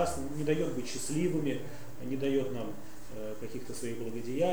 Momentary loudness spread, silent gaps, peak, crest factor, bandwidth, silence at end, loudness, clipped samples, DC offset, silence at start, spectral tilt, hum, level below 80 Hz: 12 LU; none; -14 dBFS; 18 dB; over 20 kHz; 0 s; -35 LUFS; under 0.1%; 1%; 0 s; -5.5 dB/octave; none; -56 dBFS